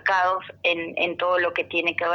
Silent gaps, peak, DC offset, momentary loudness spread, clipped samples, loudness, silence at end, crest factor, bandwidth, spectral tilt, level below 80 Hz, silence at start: none; -8 dBFS; under 0.1%; 3 LU; under 0.1%; -23 LUFS; 0 s; 16 dB; 6.8 kHz; -4 dB/octave; -68 dBFS; 0.05 s